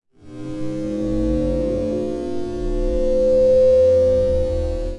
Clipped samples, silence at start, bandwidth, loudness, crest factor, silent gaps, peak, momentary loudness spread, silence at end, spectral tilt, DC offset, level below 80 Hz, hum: under 0.1%; 0 s; 10 kHz; -19 LUFS; 12 dB; none; -6 dBFS; 13 LU; 0 s; -8.5 dB/octave; 1%; -28 dBFS; none